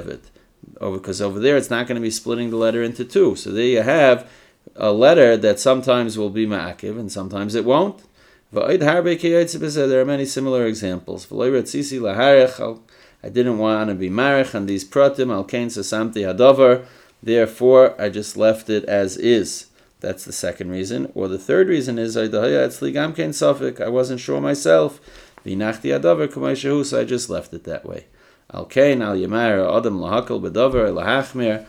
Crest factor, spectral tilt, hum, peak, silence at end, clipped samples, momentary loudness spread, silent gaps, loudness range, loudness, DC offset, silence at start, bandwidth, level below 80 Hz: 18 dB; -5 dB/octave; none; 0 dBFS; 0.05 s; under 0.1%; 14 LU; none; 5 LU; -18 LUFS; under 0.1%; 0 s; 15 kHz; -52 dBFS